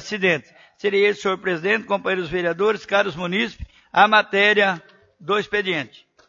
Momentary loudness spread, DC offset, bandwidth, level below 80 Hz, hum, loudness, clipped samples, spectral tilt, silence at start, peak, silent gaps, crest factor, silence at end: 11 LU; under 0.1%; 7.6 kHz; -50 dBFS; none; -20 LUFS; under 0.1%; -4.5 dB/octave; 0 s; 0 dBFS; none; 20 dB; 0.4 s